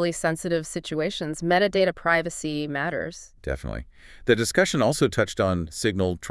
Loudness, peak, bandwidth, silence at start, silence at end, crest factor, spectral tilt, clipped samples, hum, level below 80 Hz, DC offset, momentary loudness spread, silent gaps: -24 LUFS; -4 dBFS; 12 kHz; 0 s; 0 s; 20 dB; -4.5 dB/octave; under 0.1%; none; -46 dBFS; under 0.1%; 11 LU; none